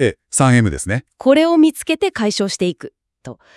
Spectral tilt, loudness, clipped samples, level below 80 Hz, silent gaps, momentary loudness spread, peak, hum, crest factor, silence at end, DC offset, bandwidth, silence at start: -5 dB/octave; -16 LUFS; under 0.1%; -44 dBFS; none; 10 LU; 0 dBFS; none; 16 dB; 0.25 s; under 0.1%; 12 kHz; 0 s